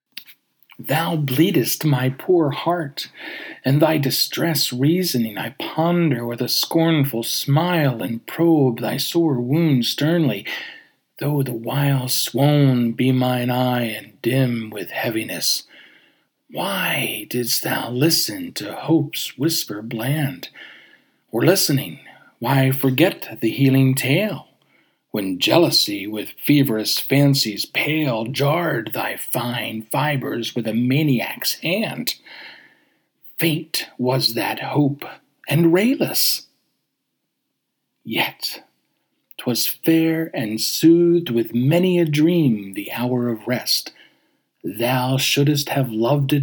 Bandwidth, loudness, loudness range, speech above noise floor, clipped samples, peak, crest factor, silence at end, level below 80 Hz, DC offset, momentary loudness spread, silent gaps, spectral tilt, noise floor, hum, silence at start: over 20 kHz; -19 LUFS; 5 LU; 56 dB; under 0.1%; 0 dBFS; 20 dB; 0 s; -72 dBFS; under 0.1%; 11 LU; none; -5 dB/octave; -76 dBFS; none; 0.15 s